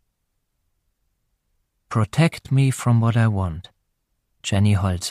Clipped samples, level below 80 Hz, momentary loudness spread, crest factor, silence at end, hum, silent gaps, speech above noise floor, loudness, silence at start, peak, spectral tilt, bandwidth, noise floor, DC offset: under 0.1%; -48 dBFS; 9 LU; 16 dB; 0 s; none; none; 54 dB; -20 LUFS; 1.9 s; -6 dBFS; -6 dB/octave; 14 kHz; -73 dBFS; under 0.1%